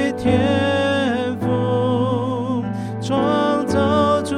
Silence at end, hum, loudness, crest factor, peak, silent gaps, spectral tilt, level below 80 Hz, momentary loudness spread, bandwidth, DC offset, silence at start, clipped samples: 0 s; none; -19 LUFS; 14 dB; -4 dBFS; none; -6.5 dB/octave; -48 dBFS; 6 LU; 12.5 kHz; under 0.1%; 0 s; under 0.1%